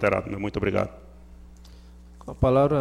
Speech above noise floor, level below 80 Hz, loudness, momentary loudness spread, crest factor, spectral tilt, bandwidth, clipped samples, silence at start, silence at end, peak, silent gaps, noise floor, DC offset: 23 dB; -42 dBFS; -25 LUFS; 18 LU; 18 dB; -8 dB/octave; 12 kHz; under 0.1%; 0 s; 0 s; -8 dBFS; none; -47 dBFS; under 0.1%